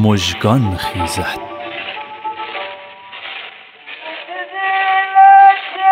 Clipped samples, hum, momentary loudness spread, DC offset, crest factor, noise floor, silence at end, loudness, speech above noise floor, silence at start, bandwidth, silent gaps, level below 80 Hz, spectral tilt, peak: under 0.1%; none; 22 LU; under 0.1%; 14 dB; -35 dBFS; 0 s; -13 LUFS; 20 dB; 0 s; 15.5 kHz; none; -48 dBFS; -5 dB/octave; 0 dBFS